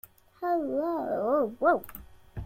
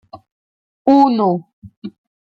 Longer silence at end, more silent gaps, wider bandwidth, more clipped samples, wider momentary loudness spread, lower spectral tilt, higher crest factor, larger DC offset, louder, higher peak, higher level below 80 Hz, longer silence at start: second, 0 s vs 0.3 s; second, none vs 0.32-0.85 s, 1.53-1.62 s, 1.77-1.82 s; first, 16.5 kHz vs 6.4 kHz; neither; second, 20 LU vs 23 LU; about the same, -8 dB/octave vs -8.5 dB/octave; about the same, 18 dB vs 16 dB; neither; second, -28 LUFS vs -15 LUFS; second, -12 dBFS vs -2 dBFS; first, -54 dBFS vs -62 dBFS; first, 0.4 s vs 0.15 s